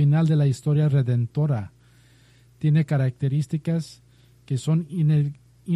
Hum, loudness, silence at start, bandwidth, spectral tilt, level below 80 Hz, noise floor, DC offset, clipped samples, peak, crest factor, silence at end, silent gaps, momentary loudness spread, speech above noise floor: none; -23 LUFS; 0 s; 10.5 kHz; -8.5 dB/octave; -60 dBFS; -55 dBFS; under 0.1%; under 0.1%; -12 dBFS; 12 dB; 0 s; none; 9 LU; 33 dB